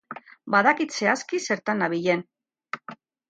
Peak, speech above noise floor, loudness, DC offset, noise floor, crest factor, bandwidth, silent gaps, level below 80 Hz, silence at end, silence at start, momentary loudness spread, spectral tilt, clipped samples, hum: -6 dBFS; 22 dB; -23 LUFS; under 0.1%; -45 dBFS; 20 dB; 9.2 kHz; none; -76 dBFS; 0.35 s; 0.1 s; 18 LU; -4 dB/octave; under 0.1%; none